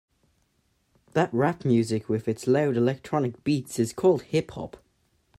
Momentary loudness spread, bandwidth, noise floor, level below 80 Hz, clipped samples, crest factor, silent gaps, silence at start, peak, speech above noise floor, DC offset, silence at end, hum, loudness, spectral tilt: 7 LU; 15 kHz; -70 dBFS; -62 dBFS; under 0.1%; 18 dB; none; 1.15 s; -8 dBFS; 45 dB; under 0.1%; 0.7 s; none; -25 LUFS; -6.5 dB/octave